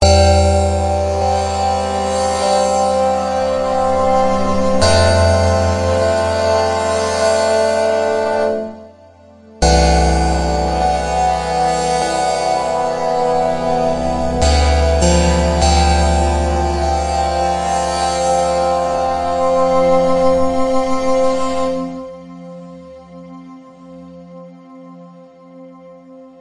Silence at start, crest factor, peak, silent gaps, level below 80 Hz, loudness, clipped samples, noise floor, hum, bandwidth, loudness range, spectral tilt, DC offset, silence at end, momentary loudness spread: 0 s; 14 dB; 0 dBFS; none; -24 dBFS; -15 LUFS; under 0.1%; -43 dBFS; none; 11.5 kHz; 4 LU; -5 dB/octave; under 0.1%; 0.1 s; 6 LU